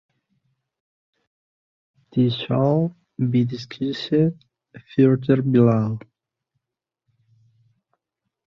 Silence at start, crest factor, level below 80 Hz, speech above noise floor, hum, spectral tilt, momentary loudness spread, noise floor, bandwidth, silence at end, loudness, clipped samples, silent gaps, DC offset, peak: 2.15 s; 20 dB; -62 dBFS; 66 dB; none; -9 dB/octave; 11 LU; -85 dBFS; 6.6 kHz; 2.5 s; -21 LUFS; under 0.1%; none; under 0.1%; -4 dBFS